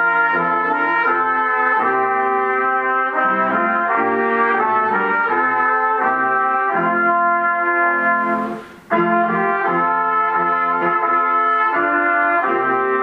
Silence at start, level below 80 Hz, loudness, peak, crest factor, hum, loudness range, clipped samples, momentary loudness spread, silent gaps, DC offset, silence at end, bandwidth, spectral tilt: 0 s; -64 dBFS; -16 LUFS; -4 dBFS; 14 dB; none; 1 LU; under 0.1%; 2 LU; none; under 0.1%; 0 s; 5.4 kHz; -7.5 dB/octave